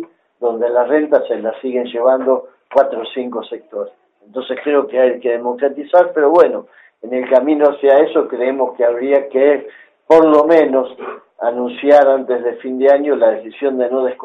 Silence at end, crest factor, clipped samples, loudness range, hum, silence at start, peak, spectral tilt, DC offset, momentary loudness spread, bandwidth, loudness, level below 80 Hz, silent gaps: 0 s; 14 dB; under 0.1%; 5 LU; none; 0 s; 0 dBFS; -6.5 dB/octave; under 0.1%; 14 LU; 6 kHz; -14 LUFS; -64 dBFS; none